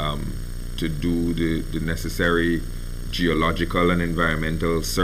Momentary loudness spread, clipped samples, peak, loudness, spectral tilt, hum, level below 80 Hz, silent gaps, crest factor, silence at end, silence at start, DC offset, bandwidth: 11 LU; under 0.1%; -8 dBFS; -23 LUFS; -5.5 dB/octave; none; -30 dBFS; none; 16 dB; 0 s; 0 s; under 0.1%; 16 kHz